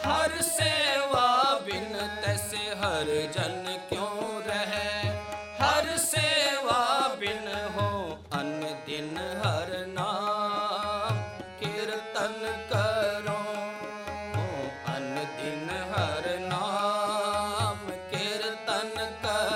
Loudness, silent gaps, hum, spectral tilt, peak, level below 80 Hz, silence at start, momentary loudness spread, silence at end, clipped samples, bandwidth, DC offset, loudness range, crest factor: -29 LUFS; none; none; -3.5 dB/octave; -10 dBFS; -56 dBFS; 0 s; 10 LU; 0 s; under 0.1%; 16 kHz; under 0.1%; 5 LU; 18 dB